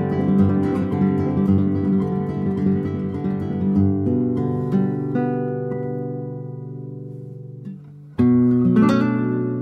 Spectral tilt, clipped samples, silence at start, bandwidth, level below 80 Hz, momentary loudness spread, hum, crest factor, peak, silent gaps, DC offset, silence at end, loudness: -10 dB/octave; under 0.1%; 0 s; 6.2 kHz; -50 dBFS; 17 LU; none; 14 dB; -6 dBFS; none; under 0.1%; 0 s; -20 LUFS